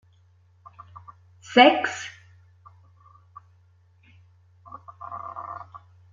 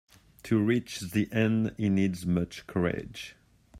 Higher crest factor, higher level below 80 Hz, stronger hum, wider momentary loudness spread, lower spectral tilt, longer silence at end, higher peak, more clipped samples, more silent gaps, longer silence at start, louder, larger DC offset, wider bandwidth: first, 26 dB vs 18 dB; second, -72 dBFS vs -58 dBFS; neither; first, 30 LU vs 15 LU; second, -3.5 dB/octave vs -6.5 dB/octave; first, 0.35 s vs 0 s; first, -2 dBFS vs -12 dBFS; neither; neither; first, 1.5 s vs 0.45 s; first, -21 LUFS vs -29 LUFS; neither; second, 7.6 kHz vs 16 kHz